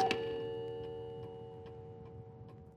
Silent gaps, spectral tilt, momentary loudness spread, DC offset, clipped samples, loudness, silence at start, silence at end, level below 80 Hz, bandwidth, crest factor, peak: none; -5.5 dB/octave; 15 LU; under 0.1%; under 0.1%; -43 LUFS; 0 s; 0 s; -66 dBFS; 12.5 kHz; 24 dB; -18 dBFS